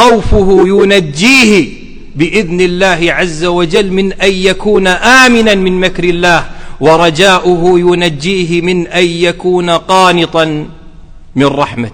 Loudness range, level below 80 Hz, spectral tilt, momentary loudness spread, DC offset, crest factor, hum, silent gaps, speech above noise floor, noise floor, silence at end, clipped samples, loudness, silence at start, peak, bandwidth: 3 LU; -24 dBFS; -4.5 dB/octave; 7 LU; under 0.1%; 8 dB; none; none; 22 dB; -30 dBFS; 0 s; 3%; -8 LUFS; 0 s; 0 dBFS; 16.5 kHz